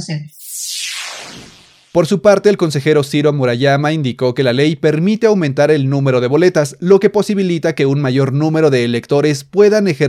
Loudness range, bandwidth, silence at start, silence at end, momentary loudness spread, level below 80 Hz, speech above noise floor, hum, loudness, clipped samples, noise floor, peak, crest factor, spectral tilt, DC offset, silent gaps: 2 LU; 16 kHz; 0 s; 0 s; 10 LU; -58 dBFS; 30 dB; none; -13 LUFS; under 0.1%; -43 dBFS; 0 dBFS; 14 dB; -6 dB/octave; under 0.1%; none